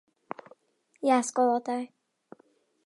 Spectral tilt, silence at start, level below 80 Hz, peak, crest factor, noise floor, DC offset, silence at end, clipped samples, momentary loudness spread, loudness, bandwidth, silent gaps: -3 dB/octave; 1 s; -88 dBFS; -10 dBFS; 20 dB; -66 dBFS; under 0.1%; 1 s; under 0.1%; 19 LU; -27 LUFS; 11.5 kHz; none